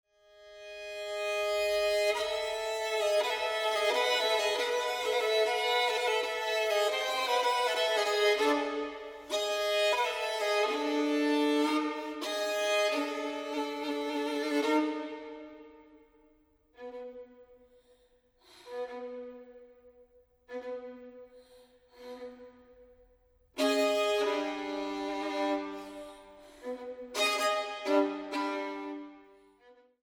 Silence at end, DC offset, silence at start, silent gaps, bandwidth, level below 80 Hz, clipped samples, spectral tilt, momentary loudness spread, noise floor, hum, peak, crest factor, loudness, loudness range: 0.3 s; under 0.1%; 0.4 s; none; 18.5 kHz; -70 dBFS; under 0.1%; -1 dB/octave; 18 LU; -67 dBFS; none; -16 dBFS; 18 dB; -30 LUFS; 18 LU